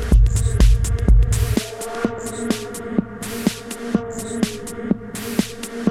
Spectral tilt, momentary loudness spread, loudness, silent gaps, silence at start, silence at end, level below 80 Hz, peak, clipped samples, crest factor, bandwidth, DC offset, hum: -5.5 dB/octave; 10 LU; -22 LUFS; none; 0 s; 0 s; -20 dBFS; -2 dBFS; under 0.1%; 16 dB; 15.5 kHz; under 0.1%; none